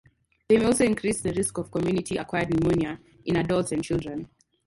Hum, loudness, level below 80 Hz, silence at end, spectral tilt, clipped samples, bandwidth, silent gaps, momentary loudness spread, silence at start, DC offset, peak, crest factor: none; -25 LUFS; -48 dBFS; 0.4 s; -5.5 dB/octave; under 0.1%; 12 kHz; none; 10 LU; 0.5 s; under 0.1%; -8 dBFS; 18 dB